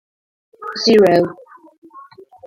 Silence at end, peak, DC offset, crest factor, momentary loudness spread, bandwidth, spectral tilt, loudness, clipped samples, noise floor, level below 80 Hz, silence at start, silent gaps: 0.45 s; -2 dBFS; under 0.1%; 16 dB; 18 LU; 15.5 kHz; -5 dB/octave; -14 LUFS; under 0.1%; -42 dBFS; -60 dBFS; 0.6 s; 1.78-1.82 s